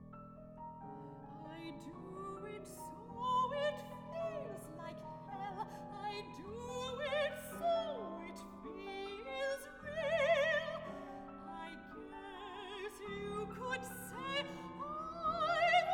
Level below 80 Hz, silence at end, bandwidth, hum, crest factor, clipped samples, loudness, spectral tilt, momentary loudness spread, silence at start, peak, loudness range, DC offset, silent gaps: -66 dBFS; 0 s; 19 kHz; none; 20 dB; under 0.1%; -41 LUFS; -4 dB/octave; 15 LU; 0 s; -20 dBFS; 7 LU; under 0.1%; none